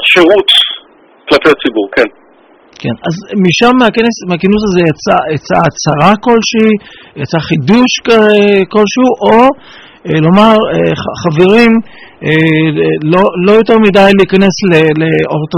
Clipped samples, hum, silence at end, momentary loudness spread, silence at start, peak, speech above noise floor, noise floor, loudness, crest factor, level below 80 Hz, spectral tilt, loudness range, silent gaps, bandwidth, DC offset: 2%; none; 0 s; 10 LU; 0 s; 0 dBFS; 35 dB; -43 dBFS; -8 LUFS; 8 dB; -40 dBFS; -5.5 dB/octave; 3 LU; none; 11 kHz; under 0.1%